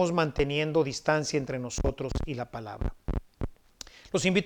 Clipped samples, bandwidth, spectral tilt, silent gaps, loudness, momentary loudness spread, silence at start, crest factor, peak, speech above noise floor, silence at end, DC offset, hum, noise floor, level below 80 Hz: under 0.1%; 19 kHz; -5 dB/octave; none; -30 LUFS; 14 LU; 0 s; 20 dB; -10 dBFS; 21 dB; 0 s; under 0.1%; none; -50 dBFS; -40 dBFS